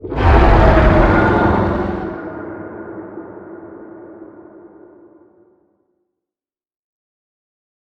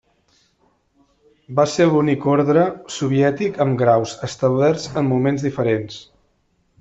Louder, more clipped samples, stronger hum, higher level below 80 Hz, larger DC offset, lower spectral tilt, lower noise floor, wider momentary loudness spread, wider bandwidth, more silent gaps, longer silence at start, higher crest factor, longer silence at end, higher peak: first, -13 LUFS vs -18 LUFS; neither; neither; first, -22 dBFS vs -56 dBFS; neither; first, -8.5 dB/octave vs -6.5 dB/octave; first, under -90 dBFS vs -64 dBFS; first, 25 LU vs 8 LU; second, 7 kHz vs 8.2 kHz; neither; second, 0.05 s vs 1.5 s; about the same, 18 dB vs 16 dB; first, 3.7 s vs 0.8 s; first, 0 dBFS vs -4 dBFS